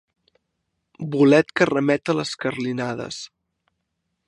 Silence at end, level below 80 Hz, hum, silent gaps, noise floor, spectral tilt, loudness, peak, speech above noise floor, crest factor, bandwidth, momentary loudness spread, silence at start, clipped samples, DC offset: 1 s; -64 dBFS; none; none; -77 dBFS; -5.5 dB/octave; -21 LUFS; -2 dBFS; 56 dB; 22 dB; 11 kHz; 18 LU; 1 s; under 0.1%; under 0.1%